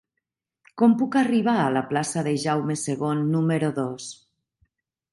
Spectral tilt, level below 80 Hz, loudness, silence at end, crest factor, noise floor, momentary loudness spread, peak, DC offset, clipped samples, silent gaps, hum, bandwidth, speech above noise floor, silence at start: -6 dB/octave; -68 dBFS; -23 LUFS; 1 s; 18 dB; -83 dBFS; 8 LU; -6 dBFS; under 0.1%; under 0.1%; none; none; 11.5 kHz; 60 dB; 0.75 s